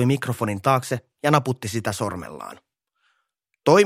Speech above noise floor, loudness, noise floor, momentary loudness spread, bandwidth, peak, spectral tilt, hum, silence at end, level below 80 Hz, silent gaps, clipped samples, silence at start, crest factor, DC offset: 52 dB; -23 LUFS; -75 dBFS; 15 LU; 16 kHz; 0 dBFS; -5.5 dB/octave; none; 0 s; -60 dBFS; none; under 0.1%; 0 s; 22 dB; under 0.1%